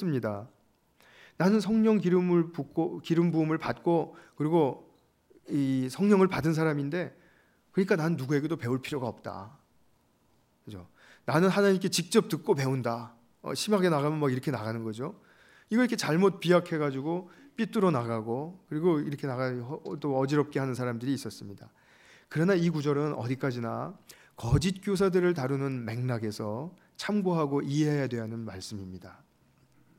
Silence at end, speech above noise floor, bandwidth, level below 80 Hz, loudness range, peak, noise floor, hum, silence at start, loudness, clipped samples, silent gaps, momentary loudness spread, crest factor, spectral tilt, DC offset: 0.85 s; 40 dB; 16 kHz; -58 dBFS; 5 LU; -8 dBFS; -68 dBFS; none; 0 s; -29 LUFS; under 0.1%; none; 15 LU; 20 dB; -6.5 dB/octave; under 0.1%